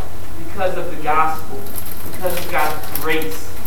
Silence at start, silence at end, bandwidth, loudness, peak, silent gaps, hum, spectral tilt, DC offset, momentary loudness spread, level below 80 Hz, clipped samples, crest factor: 0 s; 0 s; 19.5 kHz; -22 LUFS; 0 dBFS; none; none; -4 dB/octave; 20%; 12 LU; -40 dBFS; under 0.1%; 20 dB